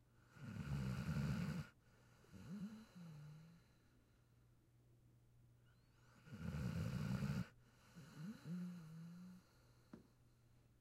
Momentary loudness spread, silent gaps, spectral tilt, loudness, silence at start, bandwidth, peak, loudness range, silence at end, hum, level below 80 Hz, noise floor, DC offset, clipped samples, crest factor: 21 LU; none; -7 dB/octave; -49 LUFS; 0 s; 15.5 kHz; -32 dBFS; 13 LU; 0.05 s; none; -64 dBFS; -73 dBFS; under 0.1%; under 0.1%; 18 dB